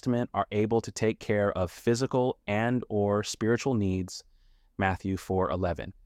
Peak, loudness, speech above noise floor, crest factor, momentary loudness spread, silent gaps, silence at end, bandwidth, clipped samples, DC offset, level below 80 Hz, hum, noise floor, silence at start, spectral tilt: -12 dBFS; -29 LUFS; 32 dB; 16 dB; 5 LU; none; 0.15 s; 15.5 kHz; under 0.1%; under 0.1%; -54 dBFS; none; -60 dBFS; 0.05 s; -6 dB/octave